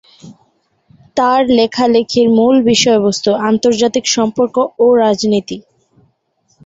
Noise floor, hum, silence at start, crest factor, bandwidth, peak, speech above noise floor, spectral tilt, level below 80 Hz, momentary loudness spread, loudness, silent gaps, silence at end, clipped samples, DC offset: -60 dBFS; none; 0.25 s; 14 dB; 8 kHz; 0 dBFS; 49 dB; -4 dB/octave; -52 dBFS; 6 LU; -12 LUFS; none; 1.05 s; under 0.1%; under 0.1%